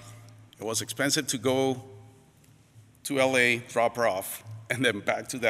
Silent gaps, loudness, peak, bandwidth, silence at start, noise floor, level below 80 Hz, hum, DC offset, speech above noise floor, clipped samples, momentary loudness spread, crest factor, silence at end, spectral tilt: none; -27 LUFS; -8 dBFS; 16 kHz; 0 s; -58 dBFS; -68 dBFS; none; under 0.1%; 31 dB; under 0.1%; 14 LU; 20 dB; 0 s; -3 dB/octave